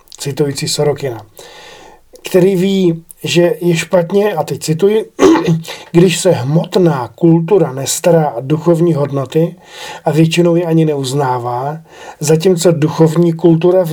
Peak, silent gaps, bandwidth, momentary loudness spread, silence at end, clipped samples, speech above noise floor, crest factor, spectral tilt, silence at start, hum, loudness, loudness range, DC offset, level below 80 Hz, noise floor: 0 dBFS; none; 17.5 kHz; 9 LU; 0 s; under 0.1%; 27 dB; 12 dB; -6 dB/octave; 0.2 s; none; -13 LUFS; 3 LU; under 0.1%; -50 dBFS; -39 dBFS